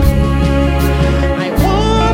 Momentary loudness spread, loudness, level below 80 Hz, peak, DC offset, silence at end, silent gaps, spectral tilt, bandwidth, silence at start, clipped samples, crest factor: 2 LU; -13 LUFS; -16 dBFS; 0 dBFS; under 0.1%; 0 s; none; -6.5 dB/octave; 16.5 kHz; 0 s; under 0.1%; 12 dB